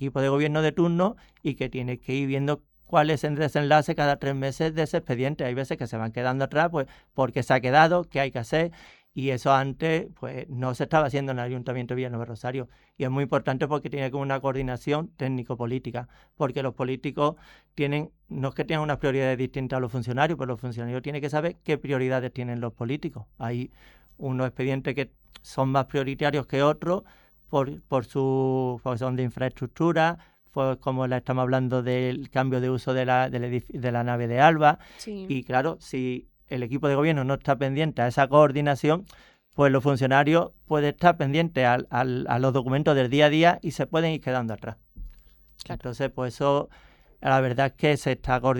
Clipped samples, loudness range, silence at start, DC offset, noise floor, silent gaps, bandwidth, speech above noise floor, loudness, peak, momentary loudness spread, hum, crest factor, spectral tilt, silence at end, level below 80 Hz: under 0.1%; 7 LU; 0 s; under 0.1%; -53 dBFS; none; 17.5 kHz; 28 dB; -26 LUFS; -4 dBFS; 11 LU; none; 22 dB; -7 dB/octave; 0 s; -52 dBFS